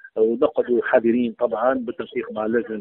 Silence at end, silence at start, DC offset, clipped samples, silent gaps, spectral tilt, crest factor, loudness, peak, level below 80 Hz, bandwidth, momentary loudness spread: 0 s; 0.05 s; under 0.1%; under 0.1%; none; -4.5 dB/octave; 20 dB; -22 LUFS; -2 dBFS; -62 dBFS; 4 kHz; 9 LU